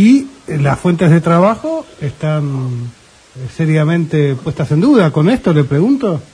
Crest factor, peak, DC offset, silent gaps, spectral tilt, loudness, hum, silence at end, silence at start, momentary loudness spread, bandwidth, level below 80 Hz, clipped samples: 12 dB; 0 dBFS; under 0.1%; none; -8 dB/octave; -13 LUFS; none; 0.1 s; 0 s; 12 LU; 10.5 kHz; -44 dBFS; under 0.1%